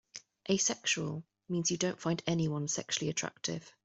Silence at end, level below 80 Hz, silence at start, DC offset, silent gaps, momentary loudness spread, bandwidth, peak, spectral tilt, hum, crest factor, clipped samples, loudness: 0.15 s; -68 dBFS; 0.15 s; under 0.1%; none; 9 LU; 8.2 kHz; -16 dBFS; -3.5 dB/octave; none; 20 dB; under 0.1%; -33 LUFS